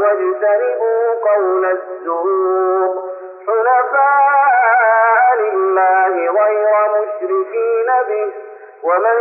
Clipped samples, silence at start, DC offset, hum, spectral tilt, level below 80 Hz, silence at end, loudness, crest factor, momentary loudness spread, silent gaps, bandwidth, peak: under 0.1%; 0 s; under 0.1%; none; -2.5 dB/octave; under -90 dBFS; 0 s; -14 LUFS; 10 dB; 9 LU; none; 2.9 kHz; -4 dBFS